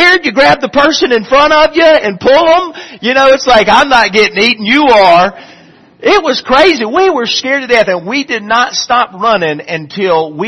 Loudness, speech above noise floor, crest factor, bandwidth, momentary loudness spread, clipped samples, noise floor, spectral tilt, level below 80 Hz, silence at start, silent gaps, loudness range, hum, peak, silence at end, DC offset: -8 LUFS; 26 dB; 8 dB; 12 kHz; 8 LU; 0.6%; -35 dBFS; -3.5 dB/octave; -40 dBFS; 0 s; none; 3 LU; none; 0 dBFS; 0 s; under 0.1%